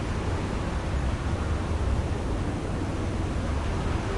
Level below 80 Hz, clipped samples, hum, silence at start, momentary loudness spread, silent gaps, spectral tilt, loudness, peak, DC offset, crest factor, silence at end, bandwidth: -32 dBFS; under 0.1%; none; 0 s; 2 LU; none; -6.5 dB/octave; -29 LUFS; -16 dBFS; 0.1%; 12 dB; 0 s; 11.5 kHz